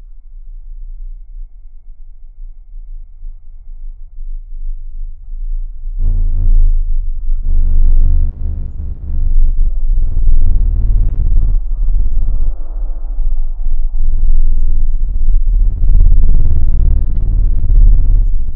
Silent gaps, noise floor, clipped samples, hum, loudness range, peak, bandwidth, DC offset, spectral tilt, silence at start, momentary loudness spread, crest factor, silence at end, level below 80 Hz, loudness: none; -30 dBFS; under 0.1%; none; 20 LU; 0 dBFS; 0.8 kHz; under 0.1%; -12.5 dB/octave; 0.05 s; 21 LU; 10 dB; 0 s; -10 dBFS; -18 LUFS